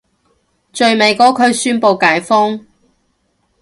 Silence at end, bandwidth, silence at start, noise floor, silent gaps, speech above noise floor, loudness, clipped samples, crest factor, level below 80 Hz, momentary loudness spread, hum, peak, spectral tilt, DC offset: 1 s; 11.5 kHz; 0.75 s; -62 dBFS; none; 51 dB; -12 LUFS; under 0.1%; 14 dB; -60 dBFS; 8 LU; none; 0 dBFS; -3 dB/octave; under 0.1%